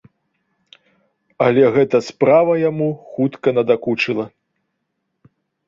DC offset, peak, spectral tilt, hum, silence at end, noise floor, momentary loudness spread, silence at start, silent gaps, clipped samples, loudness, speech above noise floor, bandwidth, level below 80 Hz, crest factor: under 0.1%; -2 dBFS; -7 dB/octave; none; 1.4 s; -74 dBFS; 9 LU; 1.4 s; none; under 0.1%; -17 LUFS; 58 dB; 7.6 kHz; -62 dBFS; 18 dB